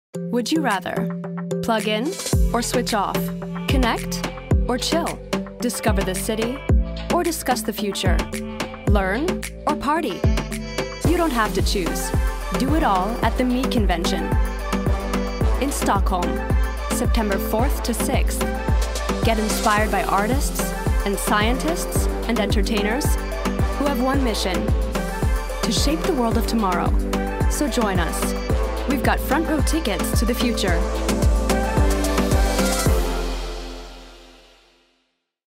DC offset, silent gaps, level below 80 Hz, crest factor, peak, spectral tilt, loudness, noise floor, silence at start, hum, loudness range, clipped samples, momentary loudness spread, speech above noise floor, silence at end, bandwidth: under 0.1%; none; -26 dBFS; 14 dB; -6 dBFS; -5 dB/octave; -22 LUFS; -70 dBFS; 0.15 s; none; 2 LU; under 0.1%; 6 LU; 50 dB; 1.2 s; 16.5 kHz